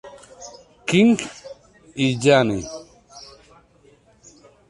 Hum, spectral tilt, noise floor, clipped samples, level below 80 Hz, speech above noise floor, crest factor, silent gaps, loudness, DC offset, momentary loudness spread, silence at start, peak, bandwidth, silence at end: none; -5.5 dB/octave; -55 dBFS; under 0.1%; -54 dBFS; 37 dB; 20 dB; none; -19 LUFS; under 0.1%; 26 LU; 0.05 s; -2 dBFS; 11.5 kHz; 1.45 s